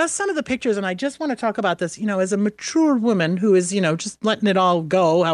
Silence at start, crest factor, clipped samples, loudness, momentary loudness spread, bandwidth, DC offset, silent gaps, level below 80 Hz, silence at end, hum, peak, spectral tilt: 0 s; 14 dB; under 0.1%; -20 LUFS; 6 LU; 11.5 kHz; under 0.1%; none; -62 dBFS; 0 s; none; -6 dBFS; -5 dB/octave